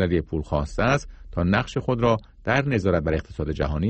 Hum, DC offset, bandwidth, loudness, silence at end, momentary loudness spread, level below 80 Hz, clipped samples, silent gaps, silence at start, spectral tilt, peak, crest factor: none; under 0.1%; 8.4 kHz; -24 LUFS; 0 s; 5 LU; -36 dBFS; under 0.1%; none; 0 s; -7 dB/octave; -6 dBFS; 16 dB